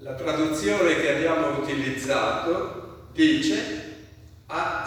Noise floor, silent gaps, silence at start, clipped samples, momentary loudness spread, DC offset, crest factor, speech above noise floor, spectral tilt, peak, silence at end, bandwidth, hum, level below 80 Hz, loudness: -47 dBFS; none; 0 s; under 0.1%; 13 LU; under 0.1%; 18 dB; 23 dB; -4.5 dB/octave; -6 dBFS; 0 s; 15.5 kHz; none; -54 dBFS; -24 LUFS